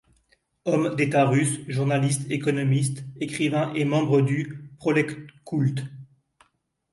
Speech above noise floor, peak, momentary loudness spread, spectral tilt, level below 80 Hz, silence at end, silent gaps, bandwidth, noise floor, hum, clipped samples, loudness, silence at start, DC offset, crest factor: 47 dB; -8 dBFS; 11 LU; -6 dB/octave; -64 dBFS; 0.9 s; none; 11.5 kHz; -70 dBFS; none; under 0.1%; -24 LUFS; 0.65 s; under 0.1%; 18 dB